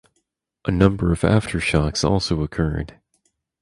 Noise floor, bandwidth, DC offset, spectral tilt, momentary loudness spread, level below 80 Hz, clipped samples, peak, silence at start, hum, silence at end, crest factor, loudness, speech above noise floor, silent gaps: -72 dBFS; 11.5 kHz; under 0.1%; -6 dB/octave; 10 LU; -34 dBFS; under 0.1%; 0 dBFS; 0.65 s; none; 0.75 s; 22 dB; -21 LUFS; 53 dB; none